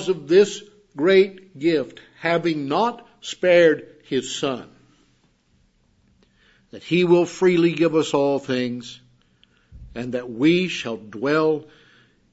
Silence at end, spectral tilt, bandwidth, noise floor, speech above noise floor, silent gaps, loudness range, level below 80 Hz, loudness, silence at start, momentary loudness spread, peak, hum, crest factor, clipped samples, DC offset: 0.7 s; -5.5 dB/octave; 8 kHz; -62 dBFS; 42 dB; none; 4 LU; -58 dBFS; -20 LUFS; 0 s; 17 LU; -4 dBFS; none; 18 dB; under 0.1%; under 0.1%